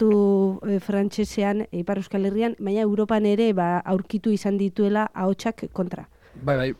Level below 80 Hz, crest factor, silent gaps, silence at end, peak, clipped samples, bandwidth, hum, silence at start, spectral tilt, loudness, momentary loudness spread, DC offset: -54 dBFS; 12 dB; none; 0.05 s; -10 dBFS; under 0.1%; 12 kHz; none; 0 s; -7.5 dB/octave; -24 LUFS; 8 LU; under 0.1%